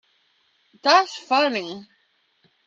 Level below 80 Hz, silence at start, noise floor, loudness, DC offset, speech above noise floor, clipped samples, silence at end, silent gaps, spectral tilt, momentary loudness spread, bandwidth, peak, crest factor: -80 dBFS; 0.85 s; -66 dBFS; -20 LUFS; under 0.1%; 45 dB; under 0.1%; 0.85 s; none; -2.5 dB/octave; 17 LU; 7.8 kHz; -2 dBFS; 22 dB